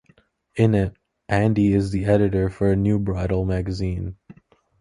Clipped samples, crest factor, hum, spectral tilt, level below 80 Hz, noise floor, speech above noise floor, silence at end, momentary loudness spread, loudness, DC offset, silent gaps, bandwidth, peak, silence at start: under 0.1%; 18 dB; none; -8.5 dB/octave; -38 dBFS; -59 dBFS; 39 dB; 0.5 s; 9 LU; -22 LUFS; under 0.1%; none; 11 kHz; -4 dBFS; 0.55 s